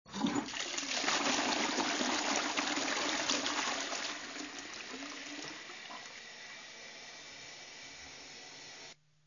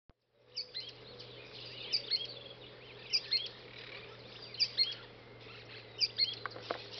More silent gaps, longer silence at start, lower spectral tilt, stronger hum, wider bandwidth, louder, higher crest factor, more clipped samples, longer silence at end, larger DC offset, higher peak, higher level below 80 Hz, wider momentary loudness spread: neither; second, 0.05 s vs 0.45 s; first, -1 dB/octave vs 0.5 dB/octave; neither; first, 7.4 kHz vs 6.4 kHz; about the same, -35 LUFS vs -35 LUFS; about the same, 22 dB vs 22 dB; neither; first, 0.35 s vs 0 s; neither; about the same, -16 dBFS vs -18 dBFS; about the same, -74 dBFS vs -72 dBFS; second, 16 LU vs 19 LU